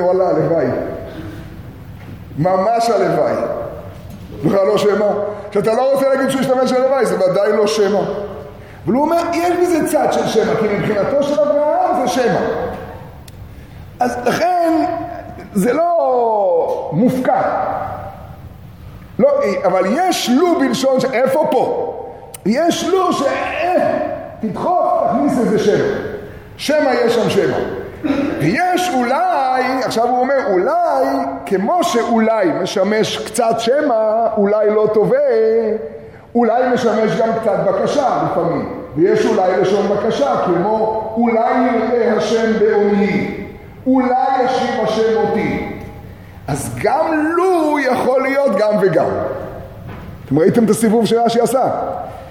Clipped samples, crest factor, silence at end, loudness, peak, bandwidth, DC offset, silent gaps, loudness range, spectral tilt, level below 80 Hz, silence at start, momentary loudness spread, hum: under 0.1%; 16 dB; 0 s; -16 LUFS; 0 dBFS; 17 kHz; 0.1%; none; 3 LU; -5.5 dB/octave; -46 dBFS; 0 s; 15 LU; none